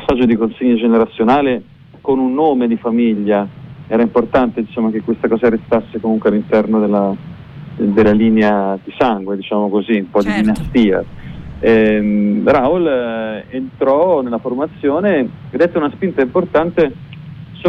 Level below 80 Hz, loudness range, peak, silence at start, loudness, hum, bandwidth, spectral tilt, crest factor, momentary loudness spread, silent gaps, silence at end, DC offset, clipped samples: -42 dBFS; 2 LU; -2 dBFS; 0 s; -15 LUFS; none; 6 kHz; -8.5 dB/octave; 12 dB; 11 LU; none; 0 s; under 0.1%; under 0.1%